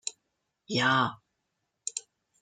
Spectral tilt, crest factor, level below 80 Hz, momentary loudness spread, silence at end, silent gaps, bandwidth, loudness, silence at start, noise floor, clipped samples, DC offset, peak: -3 dB/octave; 22 dB; -76 dBFS; 15 LU; 0.4 s; none; 9.6 kHz; -29 LUFS; 0.05 s; -81 dBFS; under 0.1%; under 0.1%; -12 dBFS